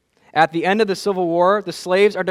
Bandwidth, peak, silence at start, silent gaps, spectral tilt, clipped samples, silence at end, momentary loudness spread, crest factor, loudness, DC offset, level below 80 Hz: 14 kHz; 0 dBFS; 0.35 s; none; -5 dB/octave; under 0.1%; 0 s; 5 LU; 18 dB; -18 LUFS; under 0.1%; -66 dBFS